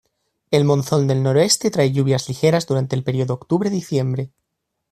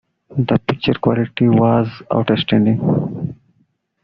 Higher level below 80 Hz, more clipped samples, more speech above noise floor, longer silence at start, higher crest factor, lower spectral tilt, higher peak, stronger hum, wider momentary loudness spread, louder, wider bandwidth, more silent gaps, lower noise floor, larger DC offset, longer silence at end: second, -56 dBFS vs -50 dBFS; neither; first, 59 dB vs 47 dB; first, 0.5 s vs 0.3 s; about the same, 16 dB vs 14 dB; about the same, -5.5 dB/octave vs -6.5 dB/octave; about the same, -2 dBFS vs -2 dBFS; neither; second, 6 LU vs 10 LU; about the same, -19 LUFS vs -17 LUFS; first, 14 kHz vs 5.6 kHz; neither; first, -77 dBFS vs -62 dBFS; neither; about the same, 0.65 s vs 0.7 s